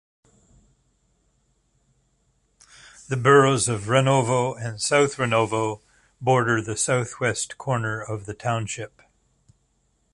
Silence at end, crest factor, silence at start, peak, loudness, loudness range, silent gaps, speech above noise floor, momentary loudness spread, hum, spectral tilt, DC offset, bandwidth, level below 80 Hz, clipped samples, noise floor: 1.25 s; 22 dB; 3.1 s; -2 dBFS; -22 LUFS; 7 LU; none; 46 dB; 14 LU; none; -4.5 dB/octave; under 0.1%; 11.5 kHz; -56 dBFS; under 0.1%; -68 dBFS